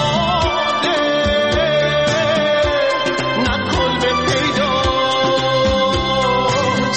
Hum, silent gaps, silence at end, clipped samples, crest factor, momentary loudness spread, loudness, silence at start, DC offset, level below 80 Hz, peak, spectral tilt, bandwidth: none; none; 0 s; under 0.1%; 10 dB; 2 LU; -16 LUFS; 0 s; 0.4%; -34 dBFS; -6 dBFS; -4.5 dB/octave; 8.8 kHz